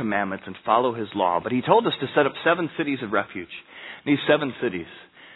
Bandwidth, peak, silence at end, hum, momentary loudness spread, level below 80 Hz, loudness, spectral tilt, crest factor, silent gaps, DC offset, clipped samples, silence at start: 4.1 kHz; -2 dBFS; 0 s; none; 15 LU; -64 dBFS; -23 LUFS; -9 dB/octave; 22 dB; none; under 0.1%; under 0.1%; 0 s